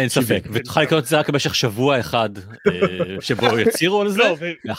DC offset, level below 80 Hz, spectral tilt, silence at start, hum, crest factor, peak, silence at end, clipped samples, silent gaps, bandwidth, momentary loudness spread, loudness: under 0.1%; -52 dBFS; -4.5 dB/octave; 0 s; none; 18 dB; -2 dBFS; 0 s; under 0.1%; none; 16.5 kHz; 6 LU; -19 LUFS